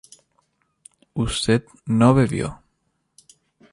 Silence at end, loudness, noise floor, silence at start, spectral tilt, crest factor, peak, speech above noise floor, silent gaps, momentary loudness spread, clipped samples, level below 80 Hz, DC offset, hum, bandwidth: 1.2 s; -20 LUFS; -71 dBFS; 1.15 s; -6 dB/octave; 20 dB; -4 dBFS; 52 dB; none; 13 LU; under 0.1%; -44 dBFS; under 0.1%; none; 11.5 kHz